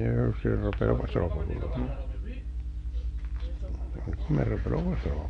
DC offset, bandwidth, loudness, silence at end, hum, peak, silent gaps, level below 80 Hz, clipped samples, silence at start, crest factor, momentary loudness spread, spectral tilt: under 0.1%; 6 kHz; -31 LUFS; 0 s; 50 Hz at -35 dBFS; -12 dBFS; none; -34 dBFS; under 0.1%; 0 s; 18 dB; 10 LU; -9.5 dB/octave